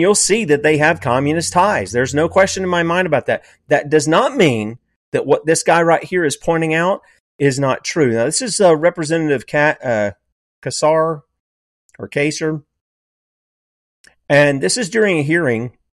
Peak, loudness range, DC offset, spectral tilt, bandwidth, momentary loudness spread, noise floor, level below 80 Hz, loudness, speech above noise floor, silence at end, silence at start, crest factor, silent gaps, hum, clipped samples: -2 dBFS; 6 LU; under 0.1%; -4.5 dB/octave; 13 kHz; 10 LU; under -90 dBFS; -52 dBFS; -16 LUFS; over 75 dB; 0.25 s; 0 s; 14 dB; 4.96-5.12 s, 7.20-7.39 s, 10.32-10.62 s, 11.40-11.89 s, 12.81-14.04 s; none; under 0.1%